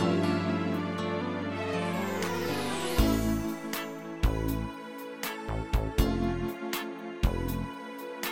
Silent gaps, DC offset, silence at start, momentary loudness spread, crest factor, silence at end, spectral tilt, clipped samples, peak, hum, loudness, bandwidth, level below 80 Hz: none; under 0.1%; 0 s; 9 LU; 20 dB; 0 s; -5.5 dB/octave; under 0.1%; -10 dBFS; none; -32 LUFS; 17 kHz; -36 dBFS